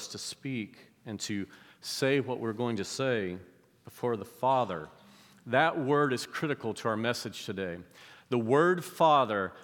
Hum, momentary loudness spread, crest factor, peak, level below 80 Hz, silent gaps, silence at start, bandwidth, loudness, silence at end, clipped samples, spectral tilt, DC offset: none; 17 LU; 20 dB; -10 dBFS; -78 dBFS; none; 0 s; 19 kHz; -30 LUFS; 0 s; under 0.1%; -5 dB/octave; under 0.1%